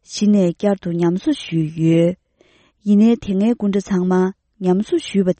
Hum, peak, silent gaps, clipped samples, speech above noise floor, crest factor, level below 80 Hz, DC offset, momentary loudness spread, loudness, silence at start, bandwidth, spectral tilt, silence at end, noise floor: none; -4 dBFS; none; under 0.1%; 39 dB; 12 dB; -52 dBFS; under 0.1%; 7 LU; -18 LUFS; 0.1 s; 8.8 kHz; -7.5 dB/octave; 0.05 s; -56 dBFS